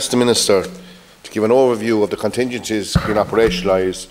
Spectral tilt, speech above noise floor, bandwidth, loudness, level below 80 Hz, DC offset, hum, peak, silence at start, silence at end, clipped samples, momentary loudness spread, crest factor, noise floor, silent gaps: -4.5 dB/octave; 23 dB; 16.5 kHz; -16 LUFS; -36 dBFS; under 0.1%; none; -2 dBFS; 0 s; 0.05 s; under 0.1%; 7 LU; 14 dB; -40 dBFS; none